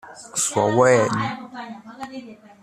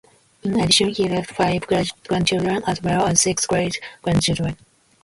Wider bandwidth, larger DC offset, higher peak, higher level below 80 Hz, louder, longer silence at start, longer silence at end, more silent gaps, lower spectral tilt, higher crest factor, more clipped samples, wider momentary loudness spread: first, 14 kHz vs 11.5 kHz; neither; about the same, -2 dBFS vs -2 dBFS; second, -62 dBFS vs -46 dBFS; about the same, -19 LUFS vs -20 LUFS; second, 0.05 s vs 0.45 s; second, 0.3 s vs 0.5 s; neither; about the same, -4 dB/octave vs -3.5 dB/octave; about the same, 20 dB vs 20 dB; neither; first, 20 LU vs 9 LU